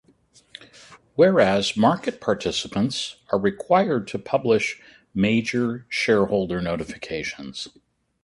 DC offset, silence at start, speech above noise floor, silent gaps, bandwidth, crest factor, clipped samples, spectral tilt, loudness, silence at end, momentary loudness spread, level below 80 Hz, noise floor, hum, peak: under 0.1%; 0.6 s; 36 dB; none; 11.5 kHz; 20 dB; under 0.1%; -5 dB/octave; -22 LUFS; 0.55 s; 14 LU; -54 dBFS; -58 dBFS; none; -4 dBFS